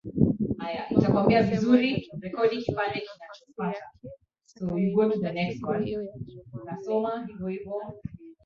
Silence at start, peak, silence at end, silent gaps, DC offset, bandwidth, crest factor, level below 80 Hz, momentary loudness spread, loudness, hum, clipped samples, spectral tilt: 0.05 s; -6 dBFS; 0.1 s; none; under 0.1%; 7 kHz; 22 dB; -52 dBFS; 20 LU; -27 LUFS; none; under 0.1%; -8 dB/octave